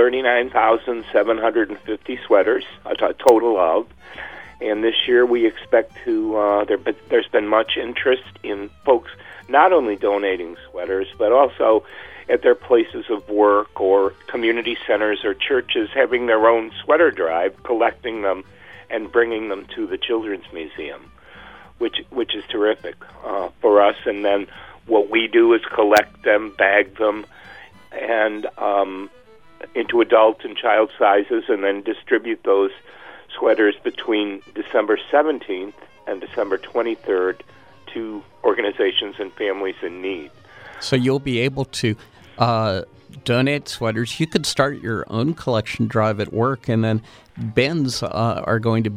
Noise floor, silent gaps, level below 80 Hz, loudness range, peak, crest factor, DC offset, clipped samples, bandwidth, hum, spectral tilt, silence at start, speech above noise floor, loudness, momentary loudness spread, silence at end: -43 dBFS; none; -54 dBFS; 6 LU; 0 dBFS; 20 dB; 0.2%; under 0.1%; 16 kHz; none; -5.5 dB/octave; 0 s; 24 dB; -19 LUFS; 14 LU; 0 s